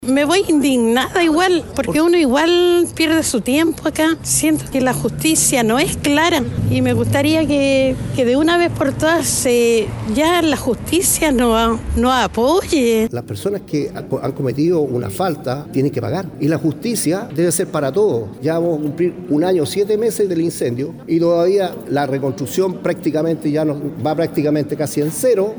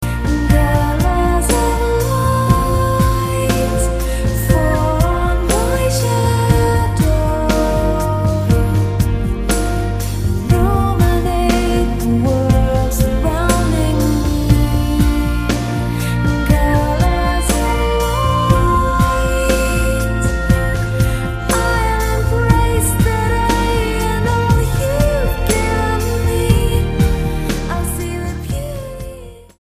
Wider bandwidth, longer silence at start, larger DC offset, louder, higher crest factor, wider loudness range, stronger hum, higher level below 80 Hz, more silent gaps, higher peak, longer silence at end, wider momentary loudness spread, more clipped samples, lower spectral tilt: first, over 20 kHz vs 15.5 kHz; about the same, 0 s vs 0 s; neither; about the same, -16 LUFS vs -16 LUFS; about the same, 14 dB vs 14 dB; first, 4 LU vs 1 LU; neither; second, -38 dBFS vs -20 dBFS; neither; about the same, -2 dBFS vs 0 dBFS; second, 0 s vs 0.15 s; about the same, 7 LU vs 5 LU; neither; second, -4.5 dB/octave vs -6 dB/octave